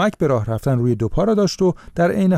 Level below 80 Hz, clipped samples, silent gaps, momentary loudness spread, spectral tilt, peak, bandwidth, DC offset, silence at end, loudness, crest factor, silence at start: -36 dBFS; under 0.1%; none; 3 LU; -7 dB/octave; -8 dBFS; 14.5 kHz; under 0.1%; 0 s; -19 LUFS; 10 dB; 0 s